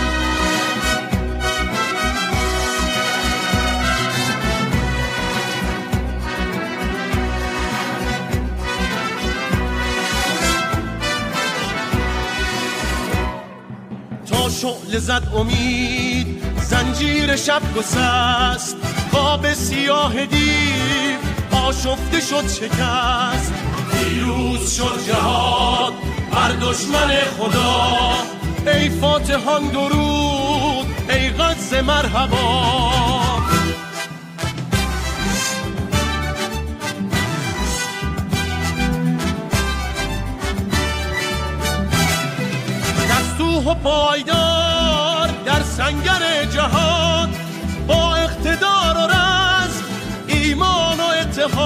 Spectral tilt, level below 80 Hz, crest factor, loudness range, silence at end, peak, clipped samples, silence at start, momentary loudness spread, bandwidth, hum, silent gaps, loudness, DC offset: -4 dB/octave; -28 dBFS; 16 dB; 5 LU; 0 s; -4 dBFS; under 0.1%; 0 s; 7 LU; 16 kHz; none; none; -18 LUFS; under 0.1%